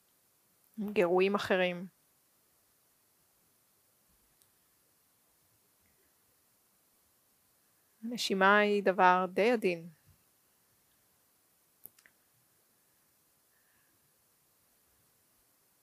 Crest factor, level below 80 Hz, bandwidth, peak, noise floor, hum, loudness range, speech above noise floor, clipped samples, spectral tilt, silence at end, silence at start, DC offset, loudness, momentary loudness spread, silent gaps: 26 dB; -82 dBFS; 15.5 kHz; -10 dBFS; -71 dBFS; none; 13 LU; 43 dB; under 0.1%; -5 dB/octave; 5.95 s; 0.75 s; under 0.1%; -29 LUFS; 29 LU; none